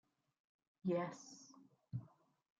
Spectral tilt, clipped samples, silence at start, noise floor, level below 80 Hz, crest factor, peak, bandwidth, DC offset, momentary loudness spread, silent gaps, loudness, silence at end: -6.5 dB/octave; under 0.1%; 0.85 s; -67 dBFS; -86 dBFS; 20 dB; -30 dBFS; 7.8 kHz; under 0.1%; 18 LU; none; -45 LUFS; 0.55 s